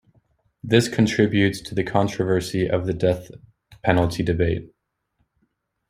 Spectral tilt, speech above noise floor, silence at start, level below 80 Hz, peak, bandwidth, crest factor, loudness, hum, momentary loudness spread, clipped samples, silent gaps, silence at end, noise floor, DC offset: -6 dB/octave; 51 dB; 0.65 s; -46 dBFS; -2 dBFS; 15.5 kHz; 20 dB; -22 LUFS; none; 8 LU; under 0.1%; none; 1.25 s; -71 dBFS; under 0.1%